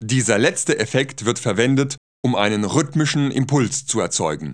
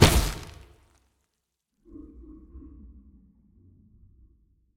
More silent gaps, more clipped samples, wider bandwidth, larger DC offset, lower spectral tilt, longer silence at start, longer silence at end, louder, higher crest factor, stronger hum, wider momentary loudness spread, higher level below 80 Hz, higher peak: first, 1.98-2.23 s vs none; neither; second, 10.5 kHz vs 18 kHz; first, 0.2% vs under 0.1%; about the same, -4.5 dB/octave vs -4.5 dB/octave; about the same, 0 s vs 0 s; second, 0 s vs 2.15 s; first, -19 LUFS vs -25 LUFS; second, 20 dB vs 26 dB; neither; second, 5 LU vs 26 LU; second, -60 dBFS vs -36 dBFS; first, 0 dBFS vs -4 dBFS